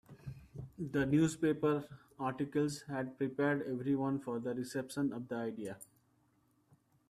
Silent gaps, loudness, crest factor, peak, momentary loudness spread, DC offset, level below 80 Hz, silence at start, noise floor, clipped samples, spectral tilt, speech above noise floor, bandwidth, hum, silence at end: none; -36 LUFS; 18 dB; -20 dBFS; 18 LU; under 0.1%; -68 dBFS; 0.1 s; -73 dBFS; under 0.1%; -6.5 dB/octave; 38 dB; 13.5 kHz; none; 1.25 s